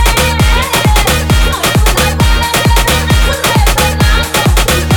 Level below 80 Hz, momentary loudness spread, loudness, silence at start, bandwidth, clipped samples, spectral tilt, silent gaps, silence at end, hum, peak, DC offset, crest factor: -12 dBFS; 1 LU; -10 LUFS; 0 s; over 20 kHz; under 0.1%; -4 dB/octave; none; 0 s; none; 0 dBFS; under 0.1%; 8 dB